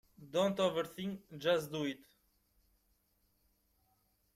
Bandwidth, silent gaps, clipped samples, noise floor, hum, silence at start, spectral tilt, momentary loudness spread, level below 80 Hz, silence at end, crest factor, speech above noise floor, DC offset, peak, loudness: 16 kHz; none; under 0.1%; -76 dBFS; none; 0.2 s; -5 dB/octave; 11 LU; -74 dBFS; 2.4 s; 20 dB; 41 dB; under 0.1%; -20 dBFS; -36 LUFS